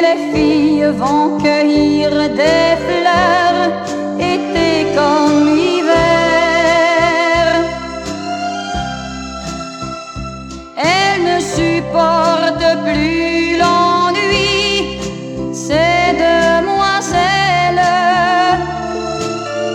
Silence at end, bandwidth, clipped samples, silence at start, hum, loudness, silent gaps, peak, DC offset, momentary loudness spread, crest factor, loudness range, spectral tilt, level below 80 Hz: 0 s; 12 kHz; under 0.1%; 0 s; none; -13 LUFS; none; 0 dBFS; under 0.1%; 12 LU; 14 dB; 5 LU; -4.5 dB/octave; -36 dBFS